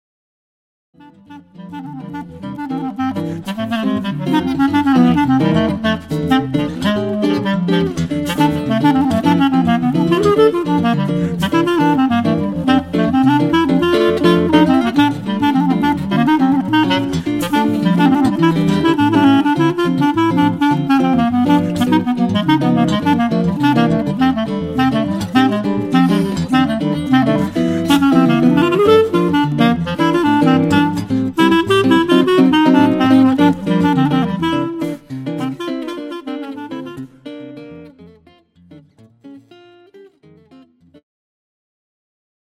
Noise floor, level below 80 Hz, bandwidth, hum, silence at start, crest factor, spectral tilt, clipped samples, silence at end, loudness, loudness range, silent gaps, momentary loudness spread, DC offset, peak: -49 dBFS; -44 dBFS; 15 kHz; none; 1.3 s; 14 dB; -7 dB/octave; under 0.1%; 2.45 s; -14 LUFS; 10 LU; none; 12 LU; under 0.1%; 0 dBFS